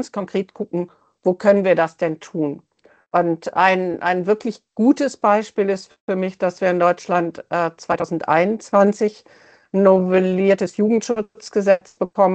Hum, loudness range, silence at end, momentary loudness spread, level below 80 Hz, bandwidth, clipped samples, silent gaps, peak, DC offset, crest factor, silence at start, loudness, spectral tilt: none; 3 LU; 0 s; 10 LU; -64 dBFS; 8.8 kHz; under 0.1%; 6.01-6.08 s; 0 dBFS; under 0.1%; 18 dB; 0 s; -19 LUFS; -6.5 dB/octave